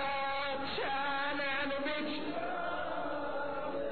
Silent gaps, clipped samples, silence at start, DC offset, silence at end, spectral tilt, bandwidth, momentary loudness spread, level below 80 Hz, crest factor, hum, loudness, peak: none; under 0.1%; 0 s; 0.7%; 0 s; -1 dB/octave; 4.6 kHz; 4 LU; -62 dBFS; 12 dB; none; -36 LUFS; -24 dBFS